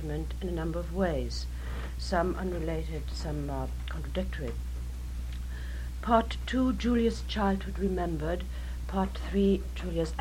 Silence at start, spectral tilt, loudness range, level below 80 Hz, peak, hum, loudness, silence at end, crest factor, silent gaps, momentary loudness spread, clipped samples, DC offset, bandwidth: 0 s; -6.5 dB/octave; 6 LU; -36 dBFS; -10 dBFS; none; -32 LUFS; 0 s; 22 dB; none; 11 LU; under 0.1%; under 0.1%; 15.5 kHz